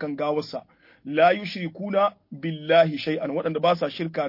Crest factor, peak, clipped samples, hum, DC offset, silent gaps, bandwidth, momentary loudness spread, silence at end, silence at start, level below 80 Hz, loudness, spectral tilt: 18 dB; -6 dBFS; under 0.1%; none; under 0.1%; none; 5.8 kHz; 13 LU; 0 s; 0 s; -70 dBFS; -24 LUFS; -7 dB/octave